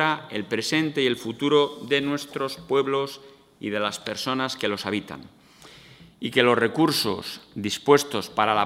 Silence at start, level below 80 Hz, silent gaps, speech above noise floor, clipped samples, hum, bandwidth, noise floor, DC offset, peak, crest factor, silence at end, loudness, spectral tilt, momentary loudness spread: 0 s; -66 dBFS; none; 25 dB; under 0.1%; none; 16 kHz; -49 dBFS; under 0.1%; -2 dBFS; 22 dB; 0 s; -24 LUFS; -4 dB/octave; 12 LU